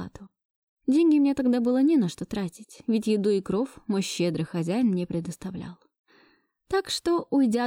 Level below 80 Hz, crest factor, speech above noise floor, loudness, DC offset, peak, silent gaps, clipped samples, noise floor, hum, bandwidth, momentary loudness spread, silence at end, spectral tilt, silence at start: -60 dBFS; 10 dB; 39 dB; -25 LUFS; under 0.1%; -14 dBFS; 0.45-0.77 s, 5.99-6.04 s; under 0.1%; -64 dBFS; none; 16 kHz; 14 LU; 0 s; -6 dB/octave; 0 s